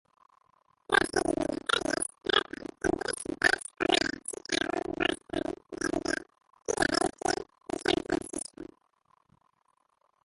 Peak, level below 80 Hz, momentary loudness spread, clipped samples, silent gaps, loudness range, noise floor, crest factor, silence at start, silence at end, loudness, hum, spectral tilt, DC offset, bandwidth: -8 dBFS; -56 dBFS; 11 LU; under 0.1%; none; 4 LU; -73 dBFS; 24 dB; 0.9 s; 1.6 s; -30 LUFS; none; -2.5 dB/octave; under 0.1%; 12 kHz